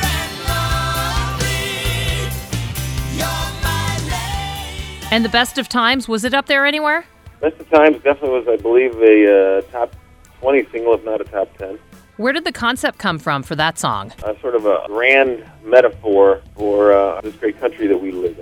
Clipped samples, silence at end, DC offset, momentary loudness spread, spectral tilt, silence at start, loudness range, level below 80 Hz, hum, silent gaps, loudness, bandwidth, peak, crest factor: under 0.1%; 0 s; under 0.1%; 11 LU; -4.5 dB/octave; 0 s; 6 LU; -32 dBFS; none; none; -17 LUFS; over 20 kHz; 0 dBFS; 16 dB